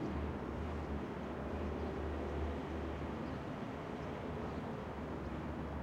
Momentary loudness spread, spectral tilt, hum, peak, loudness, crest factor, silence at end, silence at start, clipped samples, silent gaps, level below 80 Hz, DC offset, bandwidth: 3 LU; -8 dB/octave; none; -30 dBFS; -43 LUFS; 12 dB; 0 s; 0 s; under 0.1%; none; -50 dBFS; under 0.1%; 9.6 kHz